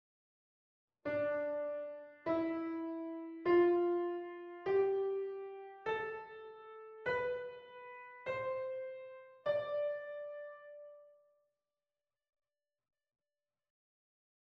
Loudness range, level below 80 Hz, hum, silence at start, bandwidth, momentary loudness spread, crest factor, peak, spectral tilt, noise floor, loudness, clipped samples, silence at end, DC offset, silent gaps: 8 LU; -78 dBFS; none; 1.05 s; 5.4 kHz; 19 LU; 18 dB; -22 dBFS; -7.5 dB/octave; under -90 dBFS; -38 LUFS; under 0.1%; 3.4 s; under 0.1%; none